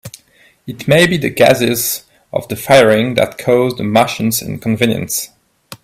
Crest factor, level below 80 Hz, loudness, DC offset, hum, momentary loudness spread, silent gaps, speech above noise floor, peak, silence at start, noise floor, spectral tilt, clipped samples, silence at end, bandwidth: 14 dB; -48 dBFS; -13 LUFS; under 0.1%; none; 14 LU; none; 37 dB; 0 dBFS; 0.05 s; -51 dBFS; -4.5 dB/octave; under 0.1%; 0.1 s; 16.5 kHz